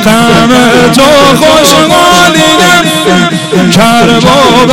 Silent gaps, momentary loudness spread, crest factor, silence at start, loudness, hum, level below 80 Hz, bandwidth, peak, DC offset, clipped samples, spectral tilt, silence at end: none; 3 LU; 4 dB; 0 s; -3 LUFS; none; -30 dBFS; 17.5 kHz; 0 dBFS; under 0.1%; 3%; -4 dB/octave; 0 s